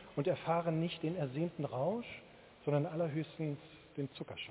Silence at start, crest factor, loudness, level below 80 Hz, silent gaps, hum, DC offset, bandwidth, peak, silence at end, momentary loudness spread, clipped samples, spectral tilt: 0 s; 18 dB; -38 LUFS; -70 dBFS; none; none; under 0.1%; 4 kHz; -20 dBFS; 0 s; 10 LU; under 0.1%; -6.5 dB/octave